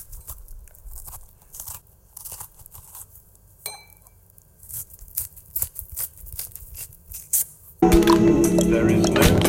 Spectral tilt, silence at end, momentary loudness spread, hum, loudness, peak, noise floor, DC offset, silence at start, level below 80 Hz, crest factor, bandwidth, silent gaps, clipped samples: -5 dB/octave; 0 s; 24 LU; none; -21 LUFS; -2 dBFS; -53 dBFS; under 0.1%; 0 s; -36 dBFS; 22 dB; 17 kHz; none; under 0.1%